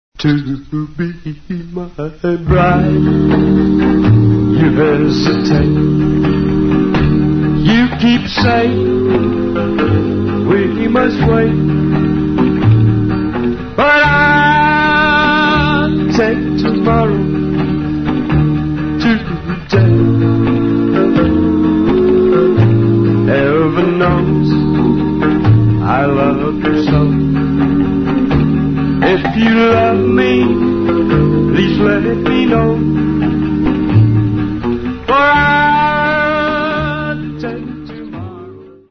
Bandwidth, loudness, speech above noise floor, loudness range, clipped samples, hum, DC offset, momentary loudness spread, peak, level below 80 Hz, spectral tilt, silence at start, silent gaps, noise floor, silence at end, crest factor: 6.4 kHz; -12 LUFS; 22 dB; 3 LU; under 0.1%; none; under 0.1%; 8 LU; 0 dBFS; -28 dBFS; -8 dB/octave; 0.2 s; none; -33 dBFS; 0.2 s; 12 dB